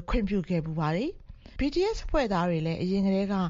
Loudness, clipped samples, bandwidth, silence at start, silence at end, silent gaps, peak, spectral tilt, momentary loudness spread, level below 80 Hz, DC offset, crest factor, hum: -28 LUFS; under 0.1%; 7.4 kHz; 0 s; 0 s; none; -14 dBFS; -6.5 dB/octave; 5 LU; -38 dBFS; under 0.1%; 14 dB; none